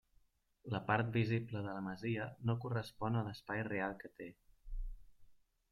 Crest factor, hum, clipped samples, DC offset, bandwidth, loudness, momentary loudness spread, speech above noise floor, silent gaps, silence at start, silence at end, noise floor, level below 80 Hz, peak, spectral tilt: 20 dB; none; under 0.1%; under 0.1%; 12 kHz; -40 LUFS; 17 LU; 34 dB; none; 0.65 s; 0.35 s; -73 dBFS; -54 dBFS; -20 dBFS; -8 dB/octave